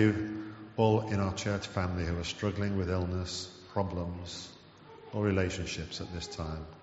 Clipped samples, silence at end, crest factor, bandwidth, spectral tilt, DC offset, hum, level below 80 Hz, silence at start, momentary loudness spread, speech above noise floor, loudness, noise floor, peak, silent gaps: under 0.1%; 0 s; 20 dB; 8 kHz; -5.5 dB/octave; under 0.1%; none; -50 dBFS; 0 s; 13 LU; 21 dB; -34 LUFS; -53 dBFS; -14 dBFS; none